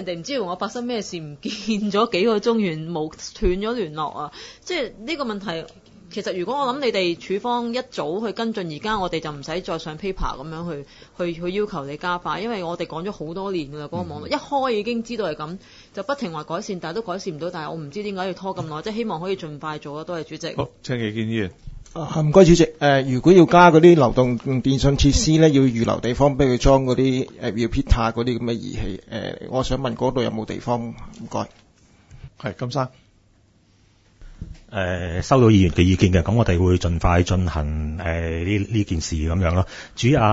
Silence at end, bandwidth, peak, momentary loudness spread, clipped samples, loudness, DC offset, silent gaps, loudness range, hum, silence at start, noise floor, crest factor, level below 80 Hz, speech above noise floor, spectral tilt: 0 s; 8 kHz; 0 dBFS; 15 LU; under 0.1%; -21 LUFS; under 0.1%; none; 13 LU; none; 0 s; -57 dBFS; 20 dB; -36 dBFS; 37 dB; -6 dB/octave